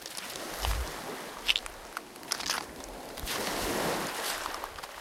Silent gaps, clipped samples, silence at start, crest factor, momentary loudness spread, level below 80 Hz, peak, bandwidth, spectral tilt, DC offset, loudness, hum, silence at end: none; under 0.1%; 0 s; 28 dB; 12 LU; -44 dBFS; -8 dBFS; 17 kHz; -2 dB/octave; under 0.1%; -34 LUFS; none; 0 s